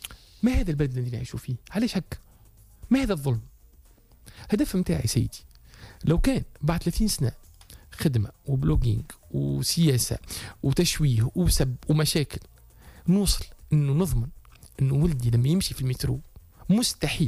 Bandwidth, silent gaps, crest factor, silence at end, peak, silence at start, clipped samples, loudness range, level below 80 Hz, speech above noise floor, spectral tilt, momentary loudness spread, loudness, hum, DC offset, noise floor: 15.5 kHz; none; 14 dB; 0 s; -12 dBFS; 0.05 s; under 0.1%; 4 LU; -36 dBFS; 30 dB; -5.5 dB/octave; 11 LU; -26 LUFS; none; under 0.1%; -54 dBFS